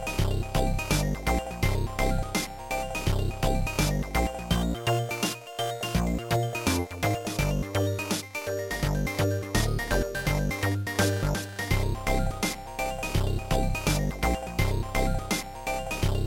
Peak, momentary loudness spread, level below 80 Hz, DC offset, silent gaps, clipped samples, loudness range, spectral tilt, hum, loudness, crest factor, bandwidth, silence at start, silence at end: -10 dBFS; 4 LU; -34 dBFS; under 0.1%; none; under 0.1%; 1 LU; -5 dB/octave; none; -28 LUFS; 18 dB; 17 kHz; 0 s; 0 s